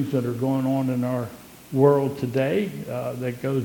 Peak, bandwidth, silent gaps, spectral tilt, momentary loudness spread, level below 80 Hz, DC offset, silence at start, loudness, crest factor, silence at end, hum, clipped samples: -4 dBFS; 19 kHz; none; -8 dB/octave; 11 LU; -62 dBFS; under 0.1%; 0 s; -24 LUFS; 20 dB; 0 s; none; under 0.1%